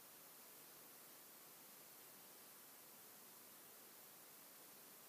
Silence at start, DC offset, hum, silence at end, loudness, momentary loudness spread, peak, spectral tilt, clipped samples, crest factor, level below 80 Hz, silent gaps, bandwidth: 0 s; under 0.1%; none; 0 s; -59 LUFS; 0 LU; -48 dBFS; -1 dB/octave; under 0.1%; 14 dB; under -90 dBFS; none; 15.5 kHz